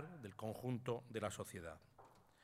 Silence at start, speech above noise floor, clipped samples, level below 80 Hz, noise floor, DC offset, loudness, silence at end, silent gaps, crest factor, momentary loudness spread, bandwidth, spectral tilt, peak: 0 s; 21 dB; under 0.1%; -76 dBFS; -67 dBFS; under 0.1%; -47 LUFS; 0 s; none; 22 dB; 22 LU; 16 kHz; -5.5 dB/octave; -26 dBFS